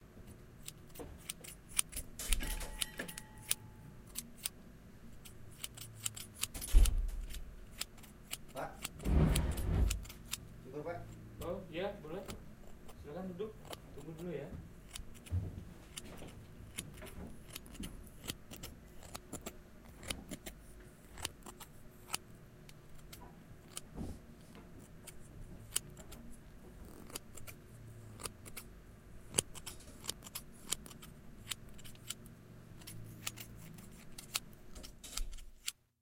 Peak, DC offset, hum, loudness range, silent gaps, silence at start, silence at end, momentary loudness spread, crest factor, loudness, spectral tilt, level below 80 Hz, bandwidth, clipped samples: -8 dBFS; under 0.1%; none; 11 LU; none; 0 s; 0.3 s; 20 LU; 34 dB; -43 LUFS; -3.5 dB/octave; -44 dBFS; 17 kHz; under 0.1%